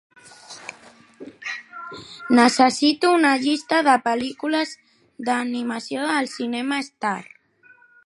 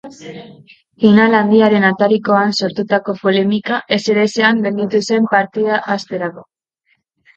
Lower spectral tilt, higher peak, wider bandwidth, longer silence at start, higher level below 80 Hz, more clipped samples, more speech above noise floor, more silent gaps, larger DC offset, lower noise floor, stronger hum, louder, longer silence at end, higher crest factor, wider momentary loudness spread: second, -3 dB/octave vs -5.5 dB/octave; about the same, -2 dBFS vs 0 dBFS; first, 11.5 kHz vs 7.8 kHz; first, 0.5 s vs 0.05 s; second, -70 dBFS vs -60 dBFS; neither; second, 34 dB vs 49 dB; neither; neither; second, -54 dBFS vs -63 dBFS; neither; second, -21 LUFS vs -14 LUFS; about the same, 0.85 s vs 0.95 s; first, 20 dB vs 14 dB; first, 20 LU vs 13 LU